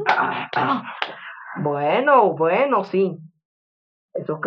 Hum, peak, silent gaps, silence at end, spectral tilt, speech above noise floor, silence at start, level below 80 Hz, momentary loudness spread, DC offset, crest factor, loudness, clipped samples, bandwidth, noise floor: none; -2 dBFS; 3.45-4.09 s; 0 s; -7 dB/octave; over 70 dB; 0 s; -76 dBFS; 17 LU; under 0.1%; 20 dB; -20 LUFS; under 0.1%; 6.6 kHz; under -90 dBFS